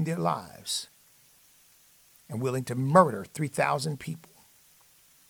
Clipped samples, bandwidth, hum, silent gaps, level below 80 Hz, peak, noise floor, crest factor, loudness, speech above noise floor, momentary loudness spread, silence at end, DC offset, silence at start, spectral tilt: under 0.1%; over 20 kHz; none; none; -68 dBFS; -4 dBFS; -60 dBFS; 26 dB; -28 LUFS; 32 dB; 18 LU; 1.1 s; under 0.1%; 0 s; -5.5 dB/octave